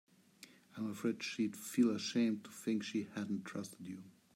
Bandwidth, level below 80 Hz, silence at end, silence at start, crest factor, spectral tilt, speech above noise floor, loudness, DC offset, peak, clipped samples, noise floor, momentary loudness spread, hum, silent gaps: 16 kHz; -88 dBFS; 0.25 s; 0.4 s; 18 dB; -5 dB/octave; 24 dB; -39 LUFS; under 0.1%; -20 dBFS; under 0.1%; -62 dBFS; 19 LU; none; none